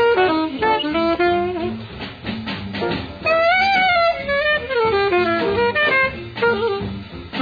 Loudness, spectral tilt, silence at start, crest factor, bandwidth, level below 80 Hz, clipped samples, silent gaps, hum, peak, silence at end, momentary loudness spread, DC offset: -18 LUFS; -6.5 dB/octave; 0 s; 12 dB; 5 kHz; -44 dBFS; under 0.1%; none; none; -6 dBFS; 0 s; 13 LU; under 0.1%